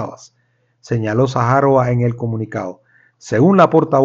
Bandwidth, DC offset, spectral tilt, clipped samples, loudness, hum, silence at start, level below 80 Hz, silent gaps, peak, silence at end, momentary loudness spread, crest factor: 7.6 kHz; under 0.1%; -8 dB/octave; under 0.1%; -15 LUFS; none; 0 s; -52 dBFS; none; 0 dBFS; 0 s; 14 LU; 16 dB